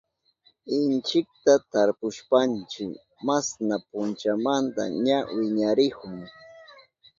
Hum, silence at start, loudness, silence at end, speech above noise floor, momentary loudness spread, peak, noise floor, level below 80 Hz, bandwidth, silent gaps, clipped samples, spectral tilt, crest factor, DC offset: none; 0.65 s; -25 LUFS; 0.55 s; 40 dB; 13 LU; -6 dBFS; -65 dBFS; -68 dBFS; 7.6 kHz; none; under 0.1%; -4.5 dB/octave; 20 dB; under 0.1%